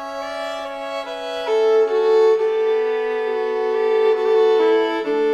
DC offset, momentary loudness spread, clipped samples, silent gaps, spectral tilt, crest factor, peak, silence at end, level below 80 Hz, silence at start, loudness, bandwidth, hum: under 0.1%; 12 LU; under 0.1%; none; -3 dB/octave; 12 dB; -8 dBFS; 0 s; -60 dBFS; 0 s; -19 LUFS; 8.4 kHz; none